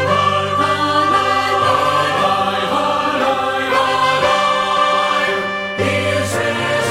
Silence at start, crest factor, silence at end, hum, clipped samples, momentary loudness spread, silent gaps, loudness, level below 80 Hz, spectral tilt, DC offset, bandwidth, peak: 0 s; 14 dB; 0 s; none; under 0.1%; 4 LU; none; -15 LUFS; -50 dBFS; -4 dB/octave; under 0.1%; 16.5 kHz; -2 dBFS